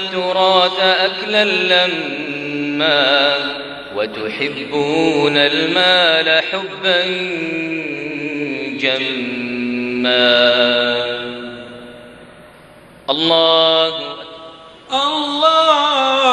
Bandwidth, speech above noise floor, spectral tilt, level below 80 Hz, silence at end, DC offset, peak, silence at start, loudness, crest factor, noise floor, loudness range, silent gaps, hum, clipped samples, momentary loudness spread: 10.5 kHz; 27 dB; -4 dB/octave; -58 dBFS; 0 s; under 0.1%; 0 dBFS; 0 s; -15 LUFS; 16 dB; -42 dBFS; 3 LU; none; none; under 0.1%; 12 LU